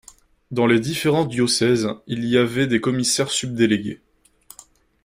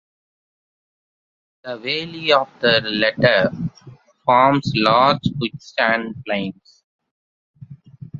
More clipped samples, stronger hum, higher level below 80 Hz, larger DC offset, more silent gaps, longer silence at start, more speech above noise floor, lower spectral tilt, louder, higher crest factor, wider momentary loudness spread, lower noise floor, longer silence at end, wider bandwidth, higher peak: neither; neither; about the same, -56 dBFS vs -56 dBFS; neither; second, none vs 6.84-6.99 s, 7.11-7.54 s; second, 0.5 s vs 1.65 s; first, 31 dB vs 21 dB; second, -4.5 dB/octave vs -6 dB/octave; about the same, -20 LUFS vs -18 LUFS; about the same, 18 dB vs 20 dB; second, 8 LU vs 14 LU; first, -50 dBFS vs -40 dBFS; first, 1.1 s vs 0 s; first, 16 kHz vs 7.6 kHz; second, -4 dBFS vs 0 dBFS